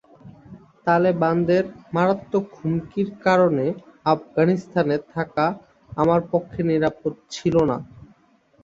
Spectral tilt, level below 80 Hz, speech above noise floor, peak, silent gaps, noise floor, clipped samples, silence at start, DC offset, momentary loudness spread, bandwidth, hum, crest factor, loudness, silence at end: -7.5 dB/octave; -54 dBFS; 37 dB; -4 dBFS; none; -58 dBFS; under 0.1%; 0.25 s; under 0.1%; 9 LU; 7.6 kHz; none; 18 dB; -22 LUFS; 0.65 s